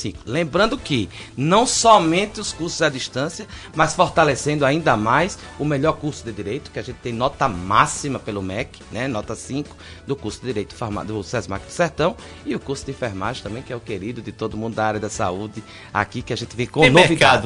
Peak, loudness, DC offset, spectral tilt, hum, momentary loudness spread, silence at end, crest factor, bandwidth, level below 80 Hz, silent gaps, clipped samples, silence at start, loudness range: 0 dBFS; -21 LUFS; under 0.1%; -4.5 dB/octave; none; 15 LU; 0 s; 20 dB; 11 kHz; -44 dBFS; none; under 0.1%; 0 s; 8 LU